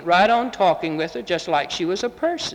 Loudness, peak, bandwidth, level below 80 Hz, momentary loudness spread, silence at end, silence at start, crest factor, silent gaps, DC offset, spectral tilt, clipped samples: -21 LUFS; -4 dBFS; 11.5 kHz; -56 dBFS; 9 LU; 0 s; 0 s; 16 dB; none; under 0.1%; -4 dB/octave; under 0.1%